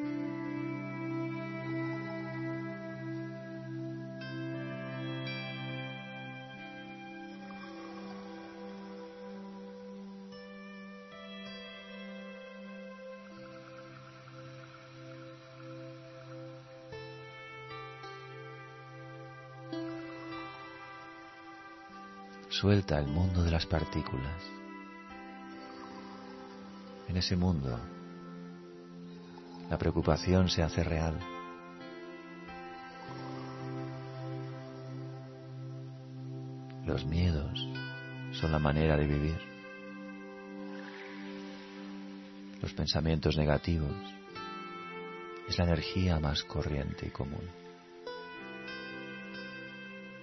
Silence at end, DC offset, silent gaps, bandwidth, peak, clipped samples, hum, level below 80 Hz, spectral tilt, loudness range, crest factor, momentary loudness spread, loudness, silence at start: 0 s; under 0.1%; none; 6 kHz; -12 dBFS; under 0.1%; none; -48 dBFS; -5.5 dB/octave; 14 LU; 24 dB; 18 LU; -37 LUFS; 0 s